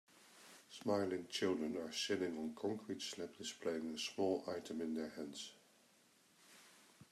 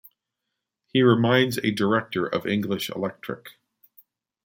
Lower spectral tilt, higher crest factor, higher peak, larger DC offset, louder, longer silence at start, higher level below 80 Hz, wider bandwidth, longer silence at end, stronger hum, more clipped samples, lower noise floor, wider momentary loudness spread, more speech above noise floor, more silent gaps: second, -4 dB/octave vs -6 dB/octave; about the same, 18 dB vs 20 dB; second, -24 dBFS vs -6 dBFS; neither; second, -43 LUFS vs -23 LUFS; second, 0.15 s vs 0.95 s; second, -84 dBFS vs -66 dBFS; second, 14.5 kHz vs 16.5 kHz; second, 0.05 s vs 0.95 s; neither; neither; second, -71 dBFS vs -83 dBFS; first, 21 LU vs 13 LU; second, 29 dB vs 60 dB; neither